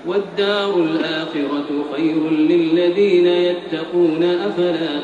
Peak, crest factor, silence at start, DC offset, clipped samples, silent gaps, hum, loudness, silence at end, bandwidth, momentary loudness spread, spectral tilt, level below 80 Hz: -6 dBFS; 12 dB; 0 s; under 0.1%; under 0.1%; none; none; -18 LUFS; 0 s; 7.6 kHz; 7 LU; -6.5 dB/octave; -62 dBFS